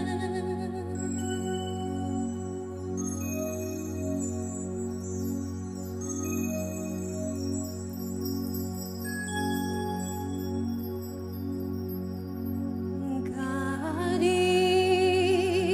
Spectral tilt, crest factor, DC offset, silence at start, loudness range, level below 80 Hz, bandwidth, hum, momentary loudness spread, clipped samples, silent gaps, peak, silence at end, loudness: -5 dB/octave; 18 dB; under 0.1%; 0 s; 6 LU; -58 dBFS; 15 kHz; none; 12 LU; under 0.1%; none; -12 dBFS; 0 s; -31 LUFS